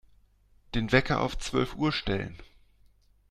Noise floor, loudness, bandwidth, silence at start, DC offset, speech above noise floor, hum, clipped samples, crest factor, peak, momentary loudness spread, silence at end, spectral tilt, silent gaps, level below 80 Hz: -62 dBFS; -28 LUFS; 14 kHz; 0.75 s; under 0.1%; 34 dB; 50 Hz at -50 dBFS; under 0.1%; 24 dB; -8 dBFS; 9 LU; 0.85 s; -5.5 dB/octave; none; -44 dBFS